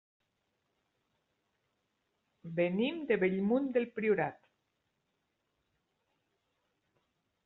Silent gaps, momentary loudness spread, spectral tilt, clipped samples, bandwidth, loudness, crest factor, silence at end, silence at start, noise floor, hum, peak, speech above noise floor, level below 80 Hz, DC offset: none; 4 LU; -5.5 dB/octave; under 0.1%; 4.2 kHz; -33 LUFS; 22 dB; 3.1 s; 2.45 s; -82 dBFS; none; -16 dBFS; 50 dB; -78 dBFS; under 0.1%